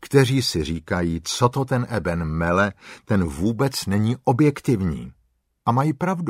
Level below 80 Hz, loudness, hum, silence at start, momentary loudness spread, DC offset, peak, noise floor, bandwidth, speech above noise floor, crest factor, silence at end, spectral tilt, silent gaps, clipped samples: -42 dBFS; -22 LUFS; none; 0 s; 7 LU; under 0.1%; -2 dBFS; -66 dBFS; 16 kHz; 45 dB; 18 dB; 0 s; -6 dB/octave; none; under 0.1%